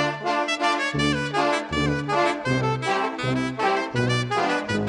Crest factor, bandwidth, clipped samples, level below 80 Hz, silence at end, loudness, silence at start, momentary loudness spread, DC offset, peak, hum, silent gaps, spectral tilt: 14 dB; 11 kHz; under 0.1%; -46 dBFS; 0 s; -23 LUFS; 0 s; 2 LU; under 0.1%; -8 dBFS; none; none; -5 dB/octave